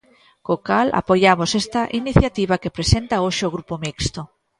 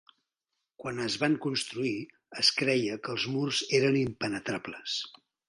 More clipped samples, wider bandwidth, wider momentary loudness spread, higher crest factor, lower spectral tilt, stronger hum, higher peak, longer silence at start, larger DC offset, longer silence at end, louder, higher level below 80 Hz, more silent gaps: neither; about the same, 11.5 kHz vs 11.5 kHz; about the same, 10 LU vs 12 LU; about the same, 20 dB vs 22 dB; about the same, -5 dB/octave vs -4 dB/octave; neither; first, 0 dBFS vs -10 dBFS; second, 0.5 s vs 0.8 s; neither; about the same, 0.35 s vs 0.4 s; first, -19 LUFS vs -29 LUFS; first, -34 dBFS vs -68 dBFS; neither